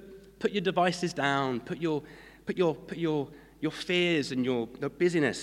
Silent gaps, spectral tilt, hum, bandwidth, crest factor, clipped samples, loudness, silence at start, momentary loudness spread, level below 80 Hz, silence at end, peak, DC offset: none; -5.5 dB/octave; none; 13 kHz; 18 dB; under 0.1%; -30 LUFS; 0 s; 10 LU; -62 dBFS; 0 s; -12 dBFS; under 0.1%